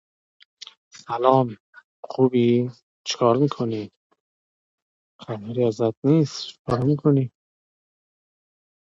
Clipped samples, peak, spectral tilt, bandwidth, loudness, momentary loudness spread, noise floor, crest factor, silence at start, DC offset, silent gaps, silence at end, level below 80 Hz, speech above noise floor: under 0.1%; -2 dBFS; -7 dB/octave; 7.8 kHz; -22 LUFS; 16 LU; under -90 dBFS; 22 dB; 0.95 s; under 0.1%; 1.60-1.73 s, 1.84-2.03 s, 2.83-3.04 s, 3.96-4.10 s, 4.20-5.19 s, 5.97-6.02 s, 6.59-6.65 s; 1.55 s; -62 dBFS; over 69 dB